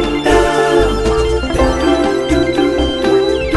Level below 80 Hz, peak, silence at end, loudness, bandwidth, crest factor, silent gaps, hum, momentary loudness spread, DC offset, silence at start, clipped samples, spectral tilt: -22 dBFS; -2 dBFS; 0 s; -13 LUFS; 11.5 kHz; 10 dB; none; none; 3 LU; under 0.1%; 0 s; under 0.1%; -5.5 dB/octave